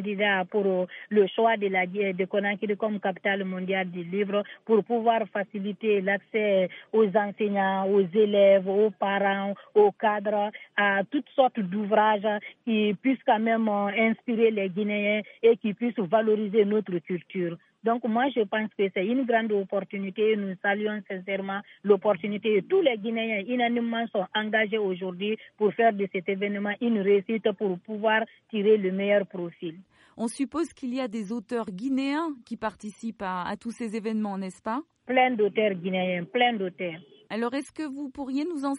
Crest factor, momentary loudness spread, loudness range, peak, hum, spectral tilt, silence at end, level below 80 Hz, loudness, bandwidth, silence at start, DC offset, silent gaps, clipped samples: 18 dB; 10 LU; 6 LU; -8 dBFS; none; -6.5 dB/octave; 0 s; -74 dBFS; -26 LUFS; 11 kHz; 0 s; under 0.1%; none; under 0.1%